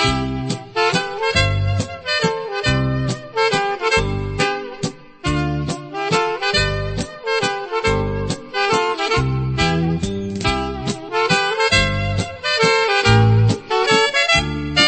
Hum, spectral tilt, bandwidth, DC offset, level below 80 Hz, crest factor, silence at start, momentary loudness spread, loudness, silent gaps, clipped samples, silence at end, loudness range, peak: none; -4.5 dB/octave; 8.8 kHz; under 0.1%; -34 dBFS; 18 dB; 0 s; 9 LU; -18 LUFS; none; under 0.1%; 0 s; 5 LU; -2 dBFS